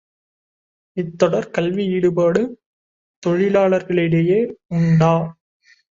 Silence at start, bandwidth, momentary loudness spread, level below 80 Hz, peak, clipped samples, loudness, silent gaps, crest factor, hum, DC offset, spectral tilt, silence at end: 0.95 s; 7.6 kHz; 12 LU; -56 dBFS; -2 dBFS; under 0.1%; -18 LUFS; 2.66-3.22 s; 18 dB; none; under 0.1%; -8 dB/octave; 0.6 s